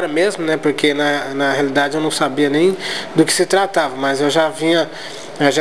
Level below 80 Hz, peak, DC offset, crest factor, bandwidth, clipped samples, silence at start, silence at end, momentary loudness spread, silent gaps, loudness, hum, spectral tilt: -64 dBFS; 0 dBFS; 1%; 16 dB; 12 kHz; under 0.1%; 0 s; 0 s; 4 LU; none; -16 LUFS; none; -3.5 dB/octave